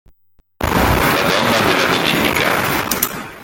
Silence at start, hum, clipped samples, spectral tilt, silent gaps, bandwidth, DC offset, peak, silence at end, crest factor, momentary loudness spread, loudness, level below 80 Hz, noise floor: 0.6 s; none; under 0.1%; -3.5 dB/octave; none; 17 kHz; under 0.1%; 0 dBFS; 0 s; 16 dB; 5 LU; -15 LUFS; -32 dBFS; -54 dBFS